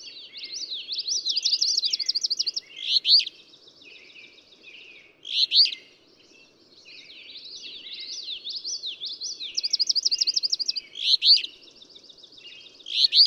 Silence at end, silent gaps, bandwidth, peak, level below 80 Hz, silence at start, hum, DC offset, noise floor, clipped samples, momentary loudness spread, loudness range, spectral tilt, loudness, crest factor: 0 s; none; 16.5 kHz; -6 dBFS; -80 dBFS; 0 s; none; under 0.1%; -56 dBFS; under 0.1%; 22 LU; 10 LU; 3.5 dB/octave; -22 LUFS; 20 dB